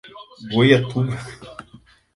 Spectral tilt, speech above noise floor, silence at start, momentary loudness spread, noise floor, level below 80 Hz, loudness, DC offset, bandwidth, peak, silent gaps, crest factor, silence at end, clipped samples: -7 dB/octave; 31 dB; 0.05 s; 24 LU; -50 dBFS; -54 dBFS; -18 LUFS; under 0.1%; 11.5 kHz; 0 dBFS; none; 20 dB; 0.55 s; under 0.1%